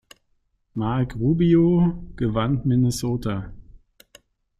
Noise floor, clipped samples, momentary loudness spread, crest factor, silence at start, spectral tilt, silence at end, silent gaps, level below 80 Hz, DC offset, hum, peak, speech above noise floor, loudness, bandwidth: -68 dBFS; under 0.1%; 12 LU; 16 dB; 0.75 s; -7.5 dB/octave; 0.8 s; none; -42 dBFS; under 0.1%; none; -8 dBFS; 47 dB; -22 LUFS; 13.5 kHz